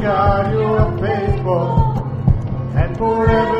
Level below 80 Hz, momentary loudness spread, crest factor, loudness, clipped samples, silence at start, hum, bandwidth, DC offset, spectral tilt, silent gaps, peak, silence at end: -26 dBFS; 5 LU; 14 dB; -17 LUFS; under 0.1%; 0 s; none; 5.8 kHz; under 0.1%; -9.5 dB/octave; none; -2 dBFS; 0 s